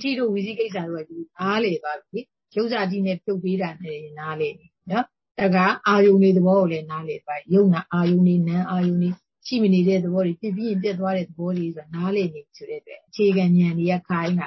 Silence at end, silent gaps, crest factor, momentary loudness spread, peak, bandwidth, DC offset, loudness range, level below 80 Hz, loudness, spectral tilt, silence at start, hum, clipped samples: 0 s; 5.31-5.35 s; 16 dB; 15 LU; -6 dBFS; 6 kHz; under 0.1%; 7 LU; -66 dBFS; -22 LUFS; -8.5 dB/octave; 0 s; none; under 0.1%